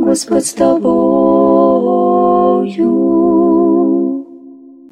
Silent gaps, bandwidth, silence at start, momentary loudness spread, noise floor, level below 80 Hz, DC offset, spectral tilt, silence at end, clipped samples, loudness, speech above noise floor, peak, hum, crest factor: none; 13.5 kHz; 0 s; 4 LU; -36 dBFS; -48 dBFS; under 0.1%; -6.5 dB/octave; 0.35 s; under 0.1%; -11 LUFS; 24 dB; 0 dBFS; none; 12 dB